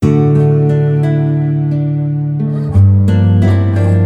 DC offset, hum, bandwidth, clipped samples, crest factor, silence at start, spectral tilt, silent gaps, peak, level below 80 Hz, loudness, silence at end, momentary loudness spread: under 0.1%; none; 4.4 kHz; under 0.1%; 10 dB; 0 s; -10 dB/octave; none; 0 dBFS; -38 dBFS; -12 LUFS; 0 s; 6 LU